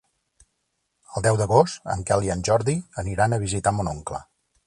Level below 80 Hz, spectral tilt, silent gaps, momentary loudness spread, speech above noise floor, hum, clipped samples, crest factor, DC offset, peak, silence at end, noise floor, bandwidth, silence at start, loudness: -44 dBFS; -5.5 dB/octave; none; 13 LU; 53 dB; none; under 0.1%; 20 dB; under 0.1%; -4 dBFS; 0.45 s; -75 dBFS; 11.5 kHz; 1.1 s; -23 LUFS